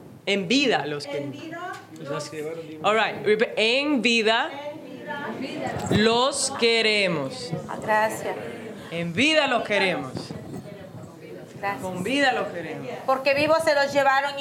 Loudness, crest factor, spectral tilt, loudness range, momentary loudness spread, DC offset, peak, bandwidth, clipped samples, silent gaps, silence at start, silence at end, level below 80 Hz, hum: -23 LUFS; 20 dB; -3.5 dB/octave; 3 LU; 17 LU; under 0.1%; -4 dBFS; 16 kHz; under 0.1%; none; 0 s; 0 s; -64 dBFS; none